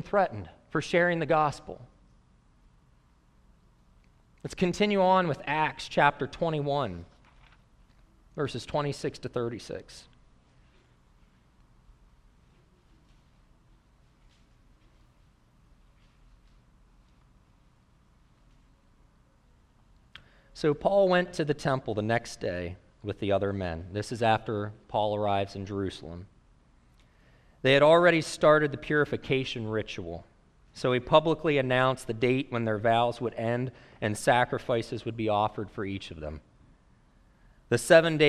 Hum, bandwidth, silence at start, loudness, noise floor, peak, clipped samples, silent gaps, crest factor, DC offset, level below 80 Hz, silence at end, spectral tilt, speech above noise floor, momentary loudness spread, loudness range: none; 14 kHz; 0 s; -27 LUFS; -62 dBFS; -6 dBFS; under 0.1%; none; 24 dB; under 0.1%; -56 dBFS; 0 s; -5.5 dB/octave; 35 dB; 17 LU; 11 LU